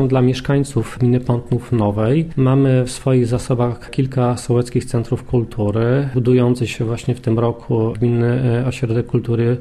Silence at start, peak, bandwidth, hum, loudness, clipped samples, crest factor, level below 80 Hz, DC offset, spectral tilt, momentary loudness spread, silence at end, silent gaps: 0 s; -4 dBFS; 12 kHz; none; -18 LUFS; under 0.1%; 12 dB; -40 dBFS; under 0.1%; -7.5 dB/octave; 6 LU; 0 s; none